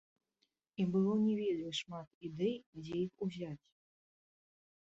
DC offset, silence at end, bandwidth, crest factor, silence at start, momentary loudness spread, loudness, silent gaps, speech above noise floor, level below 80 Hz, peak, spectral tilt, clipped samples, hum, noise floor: under 0.1%; 1.35 s; 7.8 kHz; 16 dB; 0.8 s; 15 LU; -37 LUFS; 2.07-2.21 s, 2.66-2.73 s; 46 dB; -76 dBFS; -22 dBFS; -6.5 dB/octave; under 0.1%; none; -83 dBFS